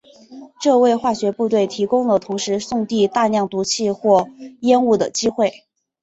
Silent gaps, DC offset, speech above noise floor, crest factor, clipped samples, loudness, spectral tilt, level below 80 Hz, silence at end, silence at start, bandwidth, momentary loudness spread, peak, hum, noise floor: none; under 0.1%; 23 dB; 16 dB; under 0.1%; -18 LUFS; -4.5 dB/octave; -60 dBFS; 0.5 s; 0.3 s; 8.2 kHz; 7 LU; -2 dBFS; none; -40 dBFS